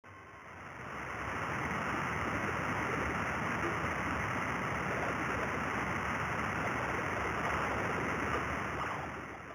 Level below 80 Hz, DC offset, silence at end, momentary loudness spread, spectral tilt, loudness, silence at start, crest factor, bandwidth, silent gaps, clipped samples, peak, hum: -52 dBFS; under 0.1%; 0 s; 8 LU; -5 dB/octave; -35 LUFS; 0.05 s; 16 dB; over 20 kHz; none; under 0.1%; -20 dBFS; none